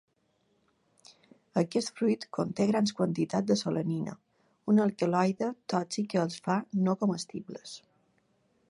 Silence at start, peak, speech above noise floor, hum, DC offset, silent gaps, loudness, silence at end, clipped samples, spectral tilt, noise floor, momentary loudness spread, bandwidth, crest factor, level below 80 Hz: 1.55 s; -12 dBFS; 44 dB; none; under 0.1%; none; -30 LUFS; 0.9 s; under 0.1%; -6 dB/octave; -73 dBFS; 13 LU; 11.5 kHz; 18 dB; -74 dBFS